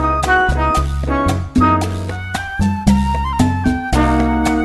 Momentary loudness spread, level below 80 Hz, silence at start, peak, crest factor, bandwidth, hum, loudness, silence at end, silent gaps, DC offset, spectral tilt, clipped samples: 7 LU; -22 dBFS; 0 s; 0 dBFS; 16 dB; 12.5 kHz; none; -16 LUFS; 0 s; none; under 0.1%; -6 dB/octave; under 0.1%